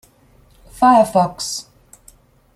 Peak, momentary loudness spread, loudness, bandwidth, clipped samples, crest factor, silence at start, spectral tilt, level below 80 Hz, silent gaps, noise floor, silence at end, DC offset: -2 dBFS; 13 LU; -16 LUFS; 15 kHz; under 0.1%; 18 dB; 0.75 s; -4.5 dB/octave; -50 dBFS; none; -52 dBFS; 0.95 s; under 0.1%